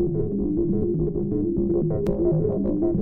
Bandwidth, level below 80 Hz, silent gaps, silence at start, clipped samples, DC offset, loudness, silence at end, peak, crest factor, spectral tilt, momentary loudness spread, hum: 2.2 kHz; -36 dBFS; none; 0 s; under 0.1%; under 0.1%; -24 LUFS; 0 s; -10 dBFS; 12 dB; -12.5 dB/octave; 3 LU; none